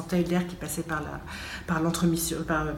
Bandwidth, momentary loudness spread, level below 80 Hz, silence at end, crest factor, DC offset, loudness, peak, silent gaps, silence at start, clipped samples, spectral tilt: 17 kHz; 11 LU; -46 dBFS; 0 s; 16 dB; under 0.1%; -29 LUFS; -12 dBFS; none; 0 s; under 0.1%; -5 dB/octave